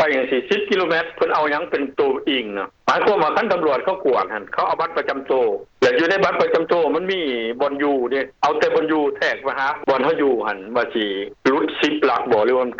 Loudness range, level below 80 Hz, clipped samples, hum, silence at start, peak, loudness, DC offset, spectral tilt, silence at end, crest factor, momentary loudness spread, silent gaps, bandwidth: 1 LU; -60 dBFS; under 0.1%; none; 0 s; -8 dBFS; -19 LUFS; under 0.1%; -5 dB/octave; 0 s; 12 dB; 5 LU; none; 7.6 kHz